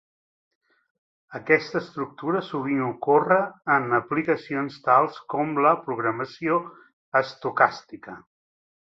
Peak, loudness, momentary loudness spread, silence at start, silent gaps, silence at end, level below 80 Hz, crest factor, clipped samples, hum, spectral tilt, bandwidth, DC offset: -2 dBFS; -24 LUFS; 14 LU; 1.3 s; 6.93-7.12 s; 0.65 s; -70 dBFS; 22 dB; under 0.1%; none; -7 dB/octave; 7.4 kHz; under 0.1%